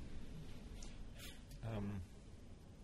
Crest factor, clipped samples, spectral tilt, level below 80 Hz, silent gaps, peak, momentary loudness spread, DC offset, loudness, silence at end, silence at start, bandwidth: 16 dB; under 0.1%; -6 dB/octave; -54 dBFS; none; -34 dBFS; 13 LU; under 0.1%; -52 LUFS; 0 s; 0 s; 14 kHz